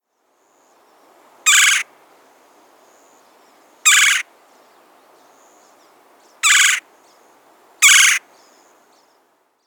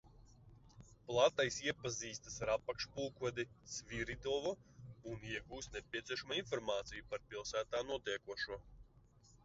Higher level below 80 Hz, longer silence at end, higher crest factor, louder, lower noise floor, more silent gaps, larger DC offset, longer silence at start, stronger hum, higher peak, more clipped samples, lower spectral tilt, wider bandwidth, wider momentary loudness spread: second, under -90 dBFS vs -64 dBFS; first, 1.5 s vs 0.45 s; about the same, 20 dB vs 24 dB; first, -12 LUFS vs -41 LUFS; second, -63 dBFS vs -67 dBFS; neither; neither; first, 1.45 s vs 0.05 s; neither; first, 0 dBFS vs -18 dBFS; neither; second, 7 dB/octave vs -2.5 dB/octave; first, over 20 kHz vs 7.6 kHz; about the same, 12 LU vs 11 LU